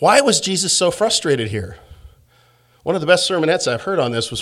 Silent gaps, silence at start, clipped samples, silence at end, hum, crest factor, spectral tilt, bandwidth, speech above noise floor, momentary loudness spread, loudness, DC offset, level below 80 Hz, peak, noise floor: none; 0 s; under 0.1%; 0 s; none; 18 dB; -3 dB/octave; 15 kHz; 38 dB; 10 LU; -17 LUFS; under 0.1%; -50 dBFS; 0 dBFS; -55 dBFS